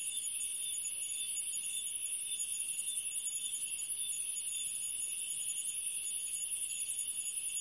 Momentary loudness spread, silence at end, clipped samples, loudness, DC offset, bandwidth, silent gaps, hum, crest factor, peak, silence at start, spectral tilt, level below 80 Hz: 1 LU; 0 s; under 0.1%; -35 LUFS; under 0.1%; 11.5 kHz; none; none; 14 dB; -24 dBFS; 0 s; 3.5 dB/octave; -82 dBFS